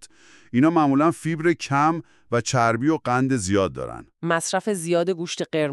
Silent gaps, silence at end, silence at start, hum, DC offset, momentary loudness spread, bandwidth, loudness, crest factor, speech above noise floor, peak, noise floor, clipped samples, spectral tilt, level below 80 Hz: none; 0 s; 0.55 s; none; under 0.1%; 8 LU; 13 kHz; -22 LUFS; 18 dB; 29 dB; -6 dBFS; -50 dBFS; under 0.1%; -5.5 dB/octave; -58 dBFS